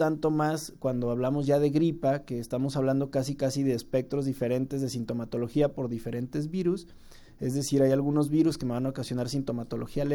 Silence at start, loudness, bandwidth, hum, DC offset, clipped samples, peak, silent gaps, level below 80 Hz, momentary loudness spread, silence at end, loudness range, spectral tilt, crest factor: 0 s; -29 LUFS; 18 kHz; none; under 0.1%; under 0.1%; -12 dBFS; none; -52 dBFS; 8 LU; 0 s; 3 LU; -7 dB/octave; 16 dB